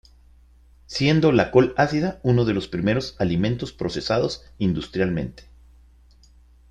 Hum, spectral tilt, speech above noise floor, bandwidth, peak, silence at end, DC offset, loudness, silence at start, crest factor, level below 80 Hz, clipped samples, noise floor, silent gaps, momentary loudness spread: none; -7 dB/octave; 31 dB; 9.6 kHz; -2 dBFS; 1.3 s; under 0.1%; -22 LUFS; 0.9 s; 20 dB; -46 dBFS; under 0.1%; -52 dBFS; none; 10 LU